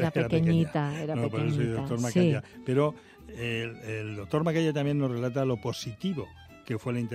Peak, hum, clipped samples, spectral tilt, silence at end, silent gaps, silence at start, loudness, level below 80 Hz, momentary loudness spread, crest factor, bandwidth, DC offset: -12 dBFS; none; under 0.1%; -7 dB/octave; 0 s; none; 0 s; -29 LUFS; -58 dBFS; 11 LU; 18 dB; 14 kHz; under 0.1%